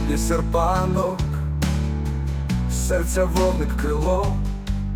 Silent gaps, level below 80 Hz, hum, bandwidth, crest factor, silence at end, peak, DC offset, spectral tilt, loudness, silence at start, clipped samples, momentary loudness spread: none; -26 dBFS; none; 18 kHz; 14 dB; 0 s; -6 dBFS; under 0.1%; -6 dB/octave; -23 LUFS; 0 s; under 0.1%; 5 LU